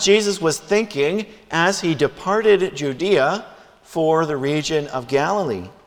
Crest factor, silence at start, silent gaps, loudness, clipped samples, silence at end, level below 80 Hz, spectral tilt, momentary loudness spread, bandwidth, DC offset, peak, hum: 18 dB; 0 s; none; -20 LUFS; under 0.1%; 0.15 s; -56 dBFS; -4 dB/octave; 7 LU; 15.5 kHz; under 0.1%; -2 dBFS; none